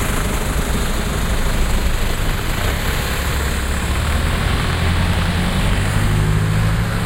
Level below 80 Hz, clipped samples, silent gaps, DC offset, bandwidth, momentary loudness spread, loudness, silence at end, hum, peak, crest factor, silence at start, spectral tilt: -20 dBFS; under 0.1%; none; under 0.1%; 16 kHz; 4 LU; -19 LUFS; 0 s; none; -4 dBFS; 14 dB; 0 s; -5 dB/octave